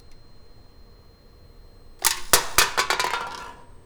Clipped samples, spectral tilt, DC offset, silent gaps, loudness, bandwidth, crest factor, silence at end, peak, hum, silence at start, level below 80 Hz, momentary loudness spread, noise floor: under 0.1%; 0 dB/octave; under 0.1%; none; -21 LUFS; over 20 kHz; 20 dB; 0.1 s; -6 dBFS; none; 0.1 s; -46 dBFS; 17 LU; -50 dBFS